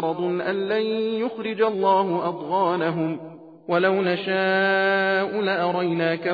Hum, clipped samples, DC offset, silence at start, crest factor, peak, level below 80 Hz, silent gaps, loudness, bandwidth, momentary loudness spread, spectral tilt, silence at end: none; under 0.1%; under 0.1%; 0 s; 14 dB; -8 dBFS; -72 dBFS; none; -22 LUFS; 5 kHz; 7 LU; -8 dB/octave; 0 s